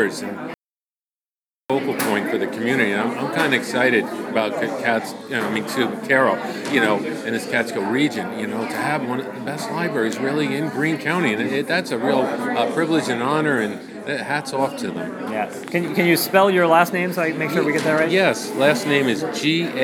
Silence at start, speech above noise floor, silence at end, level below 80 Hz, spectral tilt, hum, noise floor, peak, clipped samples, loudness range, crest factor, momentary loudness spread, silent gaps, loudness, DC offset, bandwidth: 0 s; over 70 dB; 0 s; -76 dBFS; -4.5 dB/octave; none; under -90 dBFS; 0 dBFS; under 0.1%; 5 LU; 20 dB; 9 LU; 0.56-1.68 s; -20 LUFS; under 0.1%; 19.5 kHz